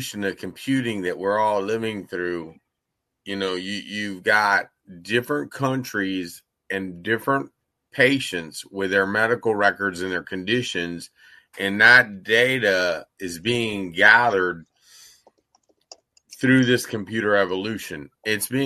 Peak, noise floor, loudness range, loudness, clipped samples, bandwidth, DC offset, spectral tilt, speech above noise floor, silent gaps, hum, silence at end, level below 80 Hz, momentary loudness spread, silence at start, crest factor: 0 dBFS; -80 dBFS; 7 LU; -21 LUFS; under 0.1%; 13.5 kHz; under 0.1%; -4.5 dB/octave; 58 dB; none; none; 0 s; -64 dBFS; 16 LU; 0 s; 22 dB